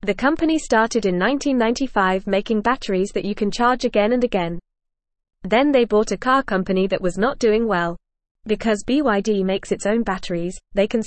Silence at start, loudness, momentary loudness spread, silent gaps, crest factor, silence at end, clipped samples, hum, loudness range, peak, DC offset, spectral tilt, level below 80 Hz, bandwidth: 0 s; -20 LUFS; 7 LU; 8.31-8.35 s; 16 dB; 0 s; under 0.1%; none; 2 LU; -4 dBFS; 0.4%; -5 dB/octave; -42 dBFS; 8.8 kHz